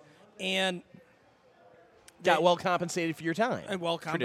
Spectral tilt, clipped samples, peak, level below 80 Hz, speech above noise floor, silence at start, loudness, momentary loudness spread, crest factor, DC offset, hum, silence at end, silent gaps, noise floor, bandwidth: -4.5 dB/octave; under 0.1%; -8 dBFS; -76 dBFS; 33 dB; 0.4 s; -29 LUFS; 8 LU; 22 dB; under 0.1%; none; 0 s; none; -62 dBFS; 15 kHz